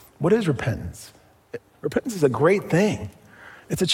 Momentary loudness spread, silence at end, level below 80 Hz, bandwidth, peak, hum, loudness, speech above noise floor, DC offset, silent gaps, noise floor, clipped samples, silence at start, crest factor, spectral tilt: 21 LU; 0 s; -52 dBFS; 16.5 kHz; -6 dBFS; none; -23 LUFS; 25 dB; under 0.1%; none; -47 dBFS; under 0.1%; 0.2 s; 18 dB; -5.5 dB/octave